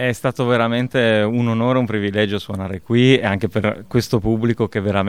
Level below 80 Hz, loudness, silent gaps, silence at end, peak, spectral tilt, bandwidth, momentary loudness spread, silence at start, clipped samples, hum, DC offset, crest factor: -46 dBFS; -18 LUFS; none; 0 s; 0 dBFS; -6.5 dB/octave; 15.5 kHz; 6 LU; 0 s; under 0.1%; none; 0.4%; 18 dB